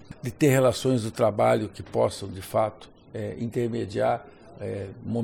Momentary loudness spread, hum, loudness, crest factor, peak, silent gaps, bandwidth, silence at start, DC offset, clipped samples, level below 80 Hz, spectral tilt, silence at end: 14 LU; none; -26 LUFS; 18 dB; -8 dBFS; none; 17.5 kHz; 0 s; under 0.1%; under 0.1%; -56 dBFS; -6 dB/octave; 0 s